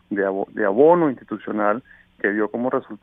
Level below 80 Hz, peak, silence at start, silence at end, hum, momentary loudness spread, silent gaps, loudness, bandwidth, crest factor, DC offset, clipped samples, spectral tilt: -64 dBFS; -2 dBFS; 0.1 s; 0.05 s; none; 12 LU; none; -21 LUFS; 3.8 kHz; 18 dB; under 0.1%; under 0.1%; -10.5 dB/octave